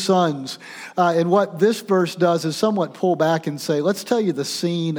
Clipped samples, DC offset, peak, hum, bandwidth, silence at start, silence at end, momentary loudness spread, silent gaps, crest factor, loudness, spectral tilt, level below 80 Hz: under 0.1%; under 0.1%; -4 dBFS; none; over 20 kHz; 0 s; 0 s; 5 LU; none; 16 dB; -20 LUFS; -5.5 dB/octave; -74 dBFS